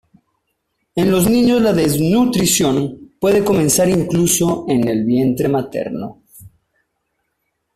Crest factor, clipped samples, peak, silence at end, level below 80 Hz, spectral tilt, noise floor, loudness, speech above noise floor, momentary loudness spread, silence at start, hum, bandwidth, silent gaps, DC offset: 14 dB; under 0.1%; -2 dBFS; 1.3 s; -46 dBFS; -5 dB/octave; -71 dBFS; -15 LUFS; 57 dB; 10 LU; 0.95 s; none; 16 kHz; none; under 0.1%